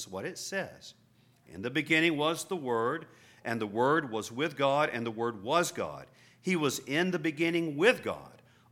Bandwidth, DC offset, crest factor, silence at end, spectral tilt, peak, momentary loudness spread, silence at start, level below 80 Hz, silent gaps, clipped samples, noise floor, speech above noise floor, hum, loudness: 17 kHz; under 0.1%; 20 dB; 0.45 s; -4.5 dB/octave; -12 dBFS; 13 LU; 0 s; -74 dBFS; none; under 0.1%; -63 dBFS; 32 dB; none; -30 LUFS